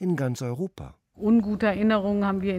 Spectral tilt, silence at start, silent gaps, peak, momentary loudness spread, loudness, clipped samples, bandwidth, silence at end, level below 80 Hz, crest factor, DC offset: -7.5 dB/octave; 0 s; none; -12 dBFS; 12 LU; -25 LUFS; under 0.1%; 11.5 kHz; 0 s; -52 dBFS; 14 dB; under 0.1%